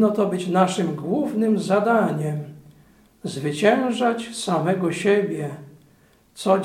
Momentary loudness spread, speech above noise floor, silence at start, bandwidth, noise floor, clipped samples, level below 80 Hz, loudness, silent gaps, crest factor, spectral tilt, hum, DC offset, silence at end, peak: 12 LU; 35 dB; 0 s; 15 kHz; -56 dBFS; under 0.1%; -66 dBFS; -22 LUFS; none; 18 dB; -6 dB/octave; none; under 0.1%; 0 s; -4 dBFS